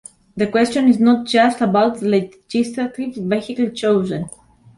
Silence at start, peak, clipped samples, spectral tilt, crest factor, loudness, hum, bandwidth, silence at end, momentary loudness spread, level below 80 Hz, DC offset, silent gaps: 0.35 s; -2 dBFS; under 0.1%; -6 dB/octave; 14 dB; -18 LUFS; none; 11.5 kHz; 0.45 s; 10 LU; -56 dBFS; under 0.1%; none